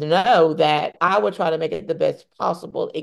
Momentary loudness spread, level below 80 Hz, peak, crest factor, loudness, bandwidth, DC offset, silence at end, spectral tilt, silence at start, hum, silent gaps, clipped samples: 10 LU; -64 dBFS; -4 dBFS; 16 dB; -20 LUFS; 12 kHz; under 0.1%; 0 s; -5.5 dB/octave; 0 s; none; none; under 0.1%